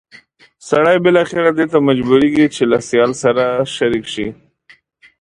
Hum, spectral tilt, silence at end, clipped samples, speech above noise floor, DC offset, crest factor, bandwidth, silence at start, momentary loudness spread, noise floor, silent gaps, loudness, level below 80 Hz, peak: none; -5.5 dB/octave; 0.9 s; under 0.1%; 36 dB; under 0.1%; 14 dB; 11 kHz; 0.65 s; 7 LU; -50 dBFS; none; -14 LUFS; -50 dBFS; 0 dBFS